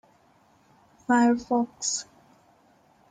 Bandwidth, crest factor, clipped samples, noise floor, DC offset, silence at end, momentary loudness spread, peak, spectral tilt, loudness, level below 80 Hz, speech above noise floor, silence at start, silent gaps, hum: 9.6 kHz; 18 dB; under 0.1%; -61 dBFS; under 0.1%; 1.1 s; 18 LU; -12 dBFS; -3 dB/octave; -25 LUFS; -68 dBFS; 37 dB; 1.1 s; none; none